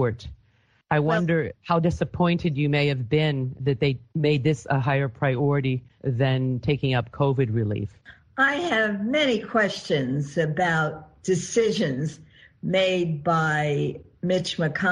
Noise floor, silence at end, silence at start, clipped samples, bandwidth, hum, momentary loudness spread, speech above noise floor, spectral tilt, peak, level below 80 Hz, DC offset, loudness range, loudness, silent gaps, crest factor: -63 dBFS; 0 s; 0 s; under 0.1%; 10 kHz; none; 6 LU; 39 dB; -6 dB/octave; -6 dBFS; -52 dBFS; under 0.1%; 1 LU; -24 LUFS; none; 18 dB